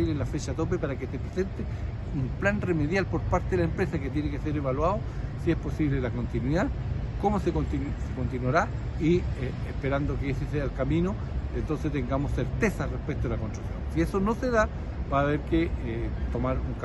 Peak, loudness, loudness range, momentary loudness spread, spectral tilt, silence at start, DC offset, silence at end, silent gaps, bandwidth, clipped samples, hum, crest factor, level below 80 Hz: -10 dBFS; -29 LUFS; 1 LU; 6 LU; -7.5 dB/octave; 0 s; under 0.1%; 0 s; none; 12 kHz; under 0.1%; none; 18 dB; -34 dBFS